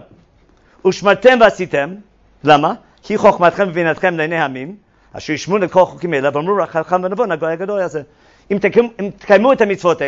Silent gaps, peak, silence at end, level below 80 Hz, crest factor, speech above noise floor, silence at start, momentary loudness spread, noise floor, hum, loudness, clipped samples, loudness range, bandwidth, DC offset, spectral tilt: none; 0 dBFS; 0 s; -52 dBFS; 16 dB; 37 dB; 0.85 s; 12 LU; -51 dBFS; none; -15 LUFS; under 0.1%; 4 LU; 8 kHz; under 0.1%; -5.5 dB/octave